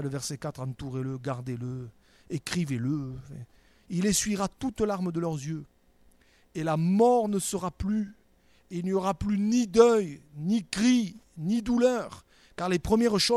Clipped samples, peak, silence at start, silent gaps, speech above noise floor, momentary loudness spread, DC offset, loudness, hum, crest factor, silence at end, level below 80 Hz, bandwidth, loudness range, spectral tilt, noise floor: under 0.1%; -6 dBFS; 0 s; none; 35 dB; 16 LU; under 0.1%; -28 LUFS; none; 22 dB; 0 s; -52 dBFS; 14 kHz; 8 LU; -5 dB/octave; -62 dBFS